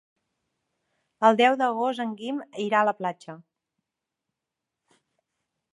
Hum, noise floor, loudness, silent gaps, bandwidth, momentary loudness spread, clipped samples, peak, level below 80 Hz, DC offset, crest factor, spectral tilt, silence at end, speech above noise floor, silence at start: none; -86 dBFS; -24 LUFS; none; 11.5 kHz; 13 LU; under 0.1%; -6 dBFS; -84 dBFS; under 0.1%; 22 dB; -5 dB/octave; 2.35 s; 62 dB; 1.2 s